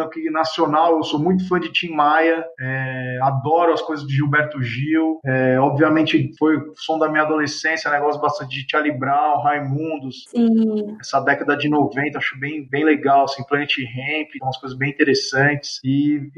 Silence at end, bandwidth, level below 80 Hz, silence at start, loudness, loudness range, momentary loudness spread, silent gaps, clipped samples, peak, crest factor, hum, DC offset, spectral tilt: 0.1 s; 8.6 kHz; -62 dBFS; 0 s; -19 LUFS; 2 LU; 8 LU; none; under 0.1%; 0 dBFS; 18 dB; none; under 0.1%; -6 dB/octave